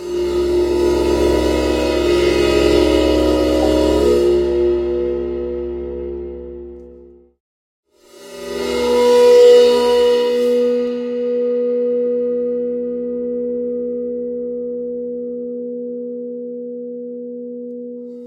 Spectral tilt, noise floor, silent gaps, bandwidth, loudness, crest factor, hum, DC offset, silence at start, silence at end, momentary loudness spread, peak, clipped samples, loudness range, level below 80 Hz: -5.5 dB/octave; -43 dBFS; 7.40-7.83 s; 16 kHz; -16 LUFS; 16 dB; none; under 0.1%; 0 s; 0 s; 16 LU; -2 dBFS; under 0.1%; 13 LU; -34 dBFS